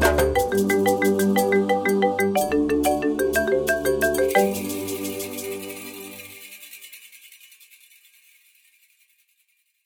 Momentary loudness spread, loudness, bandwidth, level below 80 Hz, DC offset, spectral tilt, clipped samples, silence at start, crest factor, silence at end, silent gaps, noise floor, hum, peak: 19 LU; -22 LUFS; over 20 kHz; -42 dBFS; under 0.1%; -4.5 dB/octave; under 0.1%; 0 s; 18 dB; 2.6 s; none; -68 dBFS; none; -6 dBFS